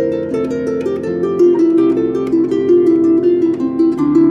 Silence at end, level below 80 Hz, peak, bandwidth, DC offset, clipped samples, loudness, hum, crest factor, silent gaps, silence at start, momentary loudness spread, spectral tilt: 0 s; -52 dBFS; -2 dBFS; 6.8 kHz; under 0.1%; under 0.1%; -14 LUFS; none; 10 dB; none; 0 s; 7 LU; -8.5 dB/octave